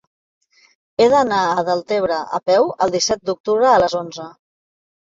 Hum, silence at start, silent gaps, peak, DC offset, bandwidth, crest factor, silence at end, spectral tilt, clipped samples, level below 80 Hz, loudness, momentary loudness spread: none; 1 s; 3.40-3.44 s; -2 dBFS; under 0.1%; 7.8 kHz; 16 dB; 0.75 s; -3.5 dB/octave; under 0.1%; -54 dBFS; -17 LUFS; 13 LU